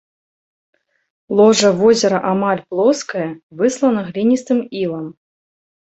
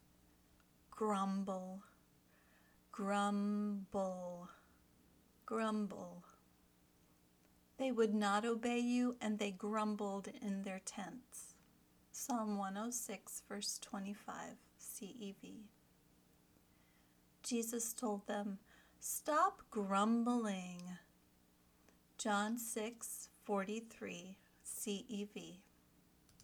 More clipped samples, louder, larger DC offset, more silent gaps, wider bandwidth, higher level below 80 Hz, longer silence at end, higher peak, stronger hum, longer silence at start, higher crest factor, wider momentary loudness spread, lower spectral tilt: neither; first, -16 LUFS vs -41 LUFS; neither; first, 3.43-3.50 s vs none; second, 8.2 kHz vs over 20 kHz; first, -60 dBFS vs -80 dBFS; first, 0.8 s vs 0 s; first, 0 dBFS vs -22 dBFS; second, none vs 60 Hz at -75 dBFS; first, 1.3 s vs 0.9 s; about the same, 16 dB vs 20 dB; second, 11 LU vs 17 LU; about the same, -5 dB/octave vs -4.5 dB/octave